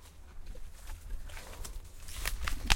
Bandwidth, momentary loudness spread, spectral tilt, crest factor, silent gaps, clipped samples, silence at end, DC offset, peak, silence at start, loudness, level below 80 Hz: 17 kHz; 15 LU; -2 dB/octave; 32 dB; none; under 0.1%; 0 s; under 0.1%; -6 dBFS; 0 s; -43 LUFS; -42 dBFS